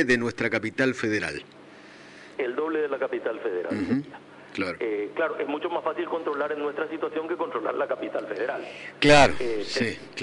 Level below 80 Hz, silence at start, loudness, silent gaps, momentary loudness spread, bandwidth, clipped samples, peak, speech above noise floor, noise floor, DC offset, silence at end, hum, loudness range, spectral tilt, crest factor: -50 dBFS; 0 s; -26 LUFS; none; 11 LU; 11 kHz; under 0.1%; -8 dBFS; 22 dB; -48 dBFS; under 0.1%; 0 s; 50 Hz at -65 dBFS; 6 LU; -4.5 dB/octave; 20 dB